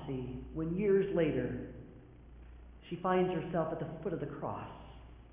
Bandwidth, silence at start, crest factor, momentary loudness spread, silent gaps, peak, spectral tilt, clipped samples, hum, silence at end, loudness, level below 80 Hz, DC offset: 3.7 kHz; 0 s; 16 dB; 25 LU; none; -20 dBFS; -7 dB/octave; under 0.1%; none; 0 s; -35 LUFS; -54 dBFS; under 0.1%